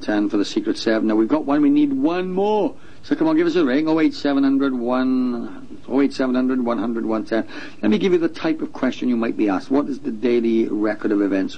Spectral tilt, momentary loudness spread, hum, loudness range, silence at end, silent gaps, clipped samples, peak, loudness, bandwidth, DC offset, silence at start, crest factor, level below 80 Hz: -6.5 dB/octave; 7 LU; none; 3 LU; 0 s; none; under 0.1%; -6 dBFS; -20 LUFS; 9.2 kHz; 2%; 0 s; 14 dB; -56 dBFS